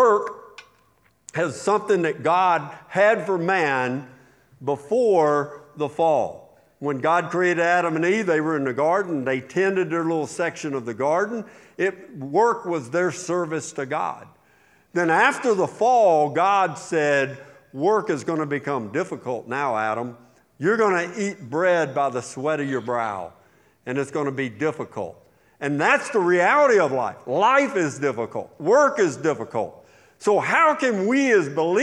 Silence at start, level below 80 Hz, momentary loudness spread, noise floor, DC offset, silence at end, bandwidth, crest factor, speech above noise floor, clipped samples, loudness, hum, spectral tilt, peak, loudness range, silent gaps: 0 s; -72 dBFS; 12 LU; -61 dBFS; under 0.1%; 0 s; 11.5 kHz; 18 dB; 40 dB; under 0.1%; -22 LUFS; none; -5 dB/octave; -4 dBFS; 5 LU; none